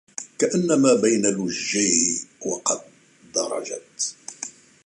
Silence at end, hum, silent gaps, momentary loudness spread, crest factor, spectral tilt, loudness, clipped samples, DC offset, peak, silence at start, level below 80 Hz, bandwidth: 0.35 s; none; none; 16 LU; 20 dB; -3 dB/octave; -22 LUFS; under 0.1%; under 0.1%; -4 dBFS; 0.2 s; -66 dBFS; 11.5 kHz